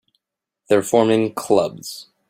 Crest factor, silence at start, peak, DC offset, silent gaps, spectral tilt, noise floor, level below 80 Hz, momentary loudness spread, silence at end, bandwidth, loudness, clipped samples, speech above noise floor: 18 dB; 0.7 s; -2 dBFS; under 0.1%; none; -5 dB/octave; -82 dBFS; -62 dBFS; 14 LU; 0.25 s; 16 kHz; -18 LUFS; under 0.1%; 64 dB